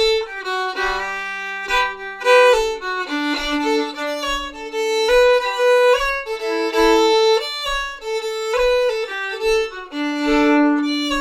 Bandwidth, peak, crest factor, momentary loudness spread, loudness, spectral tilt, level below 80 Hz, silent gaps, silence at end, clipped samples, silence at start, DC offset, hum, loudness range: 15.5 kHz; -2 dBFS; 16 dB; 10 LU; -18 LUFS; -2.5 dB/octave; -40 dBFS; none; 0 s; under 0.1%; 0 s; under 0.1%; none; 3 LU